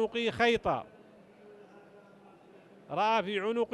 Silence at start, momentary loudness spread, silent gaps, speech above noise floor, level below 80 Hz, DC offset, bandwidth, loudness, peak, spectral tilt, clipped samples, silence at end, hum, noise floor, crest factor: 0 s; 10 LU; none; 27 dB; -64 dBFS; under 0.1%; 11.5 kHz; -30 LUFS; -14 dBFS; -5 dB/octave; under 0.1%; 0.05 s; none; -57 dBFS; 18 dB